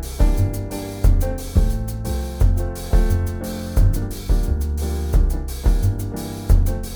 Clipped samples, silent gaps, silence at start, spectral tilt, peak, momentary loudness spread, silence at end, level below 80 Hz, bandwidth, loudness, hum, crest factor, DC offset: under 0.1%; none; 0 s; -6.5 dB/octave; -4 dBFS; 6 LU; 0 s; -20 dBFS; over 20 kHz; -22 LUFS; none; 16 dB; under 0.1%